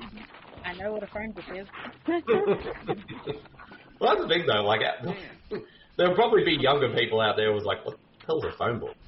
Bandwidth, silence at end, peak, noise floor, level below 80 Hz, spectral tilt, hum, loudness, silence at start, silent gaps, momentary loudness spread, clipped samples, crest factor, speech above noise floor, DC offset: 5.8 kHz; 0.15 s; -10 dBFS; -46 dBFS; -56 dBFS; -9 dB/octave; none; -26 LUFS; 0 s; none; 17 LU; under 0.1%; 16 dB; 19 dB; under 0.1%